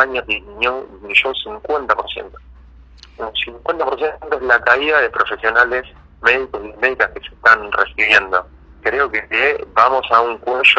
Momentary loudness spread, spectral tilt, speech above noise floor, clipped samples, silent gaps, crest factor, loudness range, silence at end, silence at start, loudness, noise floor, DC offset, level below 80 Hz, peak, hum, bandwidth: 10 LU; -3.5 dB/octave; 25 dB; under 0.1%; none; 18 dB; 5 LU; 0 s; 0 s; -16 LUFS; -42 dBFS; under 0.1%; -44 dBFS; 0 dBFS; none; 9 kHz